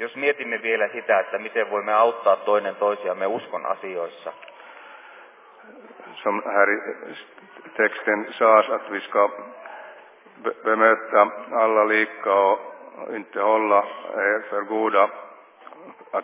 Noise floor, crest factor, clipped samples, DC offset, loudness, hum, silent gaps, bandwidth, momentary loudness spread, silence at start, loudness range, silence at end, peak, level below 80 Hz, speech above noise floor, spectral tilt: -48 dBFS; 20 dB; under 0.1%; under 0.1%; -22 LUFS; none; none; 3.9 kHz; 20 LU; 0 s; 7 LU; 0 s; -2 dBFS; under -90 dBFS; 26 dB; -7.5 dB/octave